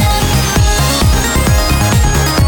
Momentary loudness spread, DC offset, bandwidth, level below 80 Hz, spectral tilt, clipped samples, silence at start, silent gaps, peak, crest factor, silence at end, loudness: 1 LU; under 0.1%; 19 kHz; -14 dBFS; -4 dB/octave; under 0.1%; 0 s; none; 0 dBFS; 10 dB; 0 s; -11 LUFS